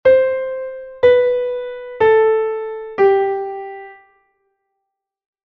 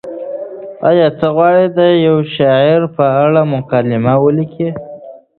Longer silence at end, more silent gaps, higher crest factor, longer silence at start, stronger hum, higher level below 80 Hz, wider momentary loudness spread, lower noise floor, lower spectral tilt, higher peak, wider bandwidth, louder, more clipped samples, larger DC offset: first, 1.5 s vs 0.2 s; neither; about the same, 16 dB vs 12 dB; about the same, 0.05 s vs 0.05 s; neither; about the same, -54 dBFS vs -52 dBFS; about the same, 16 LU vs 14 LU; first, -78 dBFS vs -33 dBFS; second, -7 dB/octave vs -10.5 dB/octave; about the same, -2 dBFS vs 0 dBFS; about the same, 4.7 kHz vs 4.4 kHz; second, -16 LUFS vs -12 LUFS; neither; neither